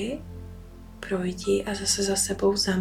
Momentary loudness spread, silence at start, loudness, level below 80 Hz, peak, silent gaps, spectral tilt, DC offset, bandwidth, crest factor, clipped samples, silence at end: 20 LU; 0 s; -25 LUFS; -46 dBFS; -10 dBFS; none; -3.5 dB/octave; under 0.1%; 17 kHz; 16 dB; under 0.1%; 0 s